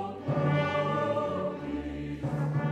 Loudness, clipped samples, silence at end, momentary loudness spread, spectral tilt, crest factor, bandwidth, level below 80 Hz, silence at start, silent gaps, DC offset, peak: -30 LUFS; under 0.1%; 0 s; 8 LU; -8 dB/octave; 14 dB; 8.2 kHz; -52 dBFS; 0 s; none; under 0.1%; -16 dBFS